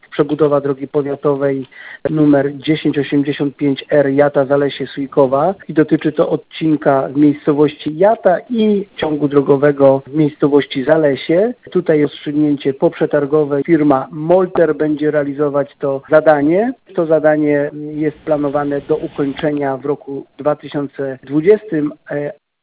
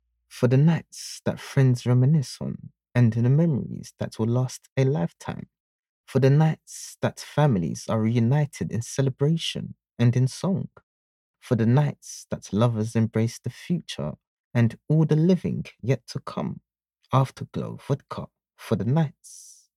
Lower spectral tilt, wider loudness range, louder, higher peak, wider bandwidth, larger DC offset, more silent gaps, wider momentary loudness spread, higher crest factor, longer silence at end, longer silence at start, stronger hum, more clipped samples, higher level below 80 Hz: first, -11 dB/octave vs -7 dB/octave; about the same, 4 LU vs 3 LU; first, -15 LUFS vs -25 LUFS; first, 0 dBFS vs -6 dBFS; second, 4 kHz vs 12.5 kHz; neither; second, none vs 4.72-4.76 s, 5.60-5.83 s, 5.89-6.04 s, 10.83-11.34 s, 14.27-14.51 s; second, 8 LU vs 15 LU; about the same, 14 dB vs 18 dB; about the same, 0.3 s vs 0.35 s; second, 0.1 s vs 0.35 s; neither; neither; first, -54 dBFS vs -60 dBFS